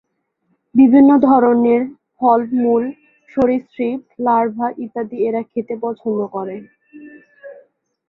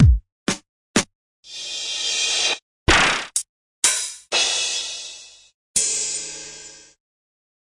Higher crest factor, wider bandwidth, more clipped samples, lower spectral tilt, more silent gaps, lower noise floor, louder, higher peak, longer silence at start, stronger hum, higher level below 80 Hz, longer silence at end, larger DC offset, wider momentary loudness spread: about the same, 16 dB vs 20 dB; second, 4.1 kHz vs 11.5 kHz; neither; first, -10 dB/octave vs -2.5 dB/octave; second, none vs 0.32-0.46 s, 0.69-0.94 s, 1.15-1.43 s, 2.62-2.86 s, 3.49-3.82 s, 5.54-5.74 s; first, -67 dBFS vs -41 dBFS; first, -16 LUFS vs -21 LUFS; about the same, -2 dBFS vs -2 dBFS; first, 0.75 s vs 0 s; neither; second, -58 dBFS vs -32 dBFS; second, 0.55 s vs 0.9 s; neither; about the same, 16 LU vs 18 LU